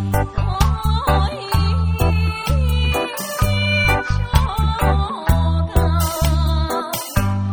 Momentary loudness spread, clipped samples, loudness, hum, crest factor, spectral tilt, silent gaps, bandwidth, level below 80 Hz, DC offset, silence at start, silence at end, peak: 4 LU; under 0.1%; -19 LUFS; none; 18 dB; -5.5 dB/octave; none; over 20 kHz; -22 dBFS; 0.2%; 0 s; 0 s; 0 dBFS